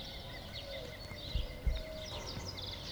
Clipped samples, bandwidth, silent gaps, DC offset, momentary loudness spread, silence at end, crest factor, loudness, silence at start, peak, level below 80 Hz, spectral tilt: under 0.1%; over 20 kHz; none; under 0.1%; 5 LU; 0 s; 20 dB; -43 LUFS; 0 s; -22 dBFS; -44 dBFS; -4 dB/octave